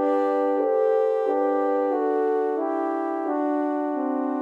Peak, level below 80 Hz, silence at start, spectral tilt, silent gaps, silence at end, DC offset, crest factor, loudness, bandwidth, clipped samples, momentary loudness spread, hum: -12 dBFS; -82 dBFS; 0 s; -6 dB/octave; none; 0 s; under 0.1%; 12 dB; -24 LUFS; 7 kHz; under 0.1%; 4 LU; none